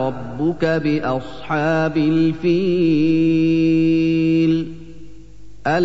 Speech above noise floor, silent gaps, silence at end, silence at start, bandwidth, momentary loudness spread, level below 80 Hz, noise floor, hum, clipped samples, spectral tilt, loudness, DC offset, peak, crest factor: 24 dB; none; 0 s; 0 s; 7.4 kHz; 8 LU; -46 dBFS; -41 dBFS; 50 Hz at -45 dBFS; under 0.1%; -8 dB/octave; -18 LUFS; 2%; -6 dBFS; 10 dB